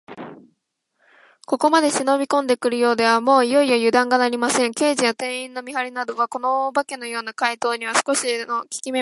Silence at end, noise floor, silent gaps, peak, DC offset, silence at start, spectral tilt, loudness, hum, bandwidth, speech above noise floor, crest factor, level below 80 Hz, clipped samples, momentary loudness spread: 0 s; -72 dBFS; none; -2 dBFS; under 0.1%; 0.1 s; -2 dB/octave; -20 LUFS; none; 11.5 kHz; 52 dB; 18 dB; -72 dBFS; under 0.1%; 11 LU